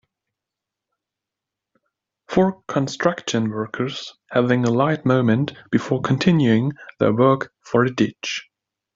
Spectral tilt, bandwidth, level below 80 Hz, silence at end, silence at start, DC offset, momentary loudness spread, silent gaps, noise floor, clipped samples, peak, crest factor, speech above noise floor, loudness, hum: -6.5 dB/octave; 7.6 kHz; -58 dBFS; 0.55 s; 2.3 s; under 0.1%; 9 LU; none; -85 dBFS; under 0.1%; -2 dBFS; 20 dB; 66 dB; -20 LUFS; none